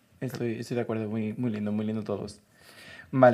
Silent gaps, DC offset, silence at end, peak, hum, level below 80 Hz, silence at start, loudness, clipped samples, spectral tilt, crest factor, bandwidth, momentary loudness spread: none; under 0.1%; 0 s; -6 dBFS; none; -70 dBFS; 0.2 s; -30 LUFS; under 0.1%; -7.5 dB/octave; 22 dB; 14.5 kHz; 17 LU